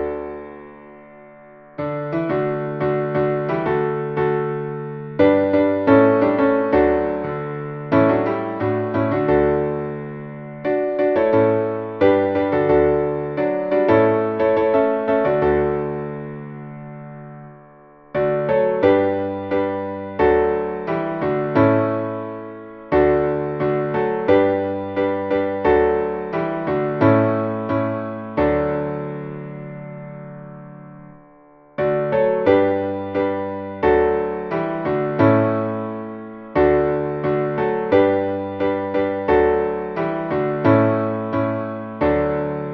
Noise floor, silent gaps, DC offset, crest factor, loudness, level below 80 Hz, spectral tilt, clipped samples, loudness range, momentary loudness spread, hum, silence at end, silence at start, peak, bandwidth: -49 dBFS; none; under 0.1%; 18 dB; -19 LUFS; -44 dBFS; -10 dB/octave; under 0.1%; 6 LU; 15 LU; none; 0 s; 0 s; -2 dBFS; 5.8 kHz